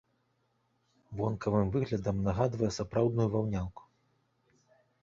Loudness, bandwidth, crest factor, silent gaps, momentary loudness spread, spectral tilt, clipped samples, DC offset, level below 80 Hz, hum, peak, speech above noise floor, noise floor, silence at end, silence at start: -32 LUFS; 7.6 kHz; 20 dB; none; 7 LU; -7.5 dB/octave; under 0.1%; under 0.1%; -52 dBFS; none; -14 dBFS; 45 dB; -75 dBFS; 1.25 s; 1.1 s